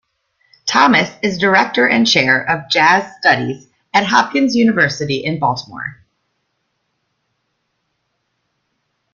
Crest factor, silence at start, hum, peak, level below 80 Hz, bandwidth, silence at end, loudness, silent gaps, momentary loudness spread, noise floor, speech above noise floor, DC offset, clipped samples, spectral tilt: 16 dB; 0.65 s; none; 0 dBFS; -58 dBFS; 7.4 kHz; 3.2 s; -14 LUFS; none; 13 LU; -70 dBFS; 55 dB; under 0.1%; under 0.1%; -4 dB/octave